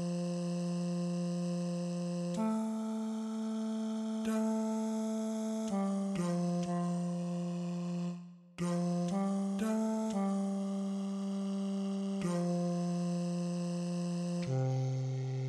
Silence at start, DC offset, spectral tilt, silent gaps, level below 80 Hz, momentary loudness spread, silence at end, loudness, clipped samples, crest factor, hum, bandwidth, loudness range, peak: 0 s; under 0.1%; -7 dB/octave; none; -76 dBFS; 4 LU; 0 s; -36 LUFS; under 0.1%; 12 dB; none; 12 kHz; 1 LU; -24 dBFS